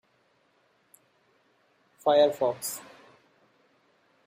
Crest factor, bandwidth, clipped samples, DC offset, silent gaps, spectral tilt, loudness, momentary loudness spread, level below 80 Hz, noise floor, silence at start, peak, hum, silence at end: 22 dB; 15.5 kHz; under 0.1%; under 0.1%; none; -3 dB/octave; -26 LUFS; 13 LU; -80 dBFS; -68 dBFS; 2.05 s; -10 dBFS; none; 1.45 s